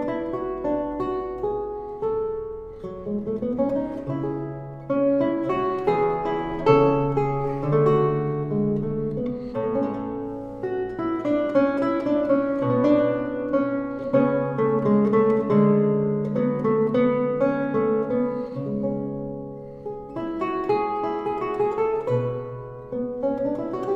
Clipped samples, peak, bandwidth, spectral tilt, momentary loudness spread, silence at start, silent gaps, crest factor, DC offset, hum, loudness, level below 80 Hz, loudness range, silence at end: under 0.1%; -2 dBFS; 6.6 kHz; -9.5 dB/octave; 12 LU; 0 s; none; 20 dB; under 0.1%; none; -24 LUFS; -50 dBFS; 7 LU; 0 s